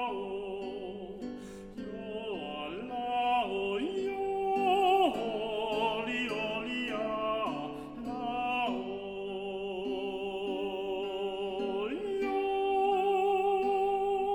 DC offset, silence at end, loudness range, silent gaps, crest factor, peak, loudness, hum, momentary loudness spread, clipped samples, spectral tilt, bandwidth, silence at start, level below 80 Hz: under 0.1%; 0 s; 5 LU; none; 18 dB; -16 dBFS; -33 LUFS; none; 12 LU; under 0.1%; -5 dB/octave; 13 kHz; 0 s; -60 dBFS